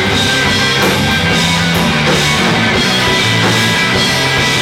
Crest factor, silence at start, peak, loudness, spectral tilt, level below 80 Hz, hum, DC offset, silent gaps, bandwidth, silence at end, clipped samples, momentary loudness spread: 10 dB; 0 s; -2 dBFS; -10 LUFS; -3.5 dB/octave; -32 dBFS; none; under 0.1%; none; 17 kHz; 0 s; under 0.1%; 1 LU